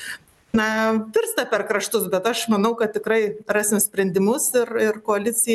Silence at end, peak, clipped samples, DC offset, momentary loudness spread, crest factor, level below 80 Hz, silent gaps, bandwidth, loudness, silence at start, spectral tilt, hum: 0 s; -8 dBFS; under 0.1%; under 0.1%; 3 LU; 14 dB; -60 dBFS; none; 13 kHz; -21 LUFS; 0 s; -3.5 dB/octave; none